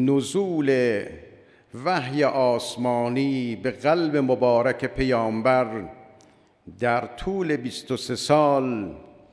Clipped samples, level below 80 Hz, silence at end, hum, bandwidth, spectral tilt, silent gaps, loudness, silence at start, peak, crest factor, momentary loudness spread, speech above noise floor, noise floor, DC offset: under 0.1%; -50 dBFS; 0.25 s; none; 11 kHz; -6 dB/octave; none; -23 LUFS; 0 s; -6 dBFS; 18 dB; 10 LU; 33 dB; -56 dBFS; under 0.1%